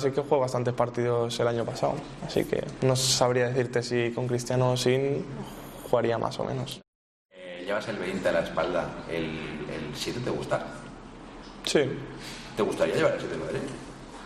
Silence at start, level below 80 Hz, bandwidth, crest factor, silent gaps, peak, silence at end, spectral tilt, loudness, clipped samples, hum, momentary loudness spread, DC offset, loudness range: 0 s; -54 dBFS; 13.5 kHz; 20 dB; 6.88-7.29 s; -8 dBFS; 0 s; -4.5 dB/octave; -28 LUFS; under 0.1%; none; 15 LU; under 0.1%; 6 LU